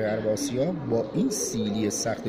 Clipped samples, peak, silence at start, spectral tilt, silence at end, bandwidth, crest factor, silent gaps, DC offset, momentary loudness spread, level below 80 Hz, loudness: under 0.1%; -14 dBFS; 0 s; -4.5 dB/octave; 0 s; 16 kHz; 12 dB; none; under 0.1%; 2 LU; -56 dBFS; -27 LUFS